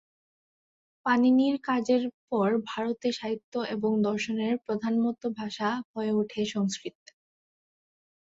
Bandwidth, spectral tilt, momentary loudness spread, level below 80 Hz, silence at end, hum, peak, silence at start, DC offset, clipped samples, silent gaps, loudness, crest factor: 8 kHz; -5.5 dB/octave; 9 LU; -72 dBFS; 1.4 s; none; -12 dBFS; 1.05 s; under 0.1%; under 0.1%; 2.14-2.28 s, 3.44-3.52 s, 5.85-5.94 s; -28 LUFS; 16 dB